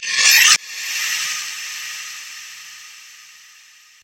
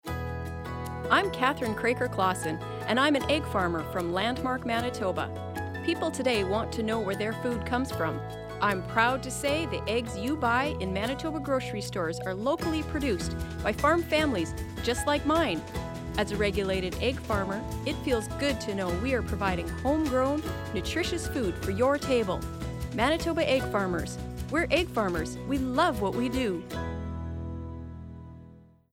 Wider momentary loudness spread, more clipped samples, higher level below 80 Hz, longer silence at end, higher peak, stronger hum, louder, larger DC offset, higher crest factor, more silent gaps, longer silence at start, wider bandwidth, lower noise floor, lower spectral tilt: first, 25 LU vs 10 LU; neither; second, -74 dBFS vs -44 dBFS; first, 0.8 s vs 0.3 s; first, 0 dBFS vs -8 dBFS; neither; first, -15 LUFS vs -29 LUFS; neither; about the same, 20 dB vs 20 dB; neither; about the same, 0 s vs 0.05 s; about the same, 16.5 kHz vs 17 kHz; second, -48 dBFS vs -52 dBFS; second, 4.5 dB/octave vs -5 dB/octave